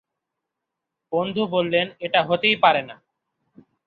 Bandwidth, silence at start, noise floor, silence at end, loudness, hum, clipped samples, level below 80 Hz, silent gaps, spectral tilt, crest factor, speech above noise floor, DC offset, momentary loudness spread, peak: 4.9 kHz; 1.1 s; -83 dBFS; 0.95 s; -21 LUFS; none; under 0.1%; -68 dBFS; none; -7.5 dB/octave; 20 dB; 62 dB; under 0.1%; 9 LU; -2 dBFS